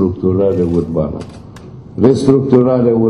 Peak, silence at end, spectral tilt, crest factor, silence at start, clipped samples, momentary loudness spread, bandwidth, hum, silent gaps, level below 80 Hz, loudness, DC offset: 0 dBFS; 0 s; -9 dB/octave; 14 dB; 0 s; 0.2%; 20 LU; 10.5 kHz; none; none; -40 dBFS; -13 LUFS; under 0.1%